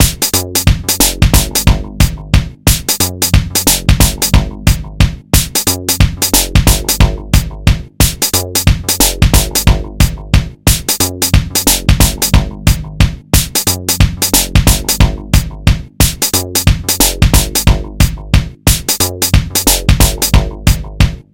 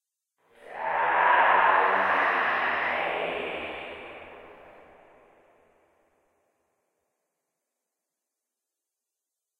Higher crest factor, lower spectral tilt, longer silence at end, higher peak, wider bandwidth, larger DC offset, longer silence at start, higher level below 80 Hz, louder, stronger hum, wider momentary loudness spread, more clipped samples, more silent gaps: second, 12 dB vs 22 dB; about the same, -3.5 dB/octave vs -4.5 dB/octave; second, 0.1 s vs 4.9 s; first, 0 dBFS vs -8 dBFS; first, over 20 kHz vs 11 kHz; first, 0.6% vs under 0.1%; second, 0 s vs 0.65 s; first, -16 dBFS vs -68 dBFS; first, -11 LUFS vs -24 LUFS; neither; second, 5 LU vs 22 LU; first, 1% vs under 0.1%; neither